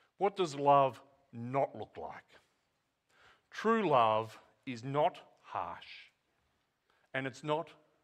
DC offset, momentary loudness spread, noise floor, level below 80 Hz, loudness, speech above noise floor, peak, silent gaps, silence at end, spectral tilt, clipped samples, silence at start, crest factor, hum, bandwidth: under 0.1%; 21 LU; -81 dBFS; -80 dBFS; -33 LUFS; 48 dB; -14 dBFS; none; 0.3 s; -6 dB/octave; under 0.1%; 0.2 s; 20 dB; none; 10 kHz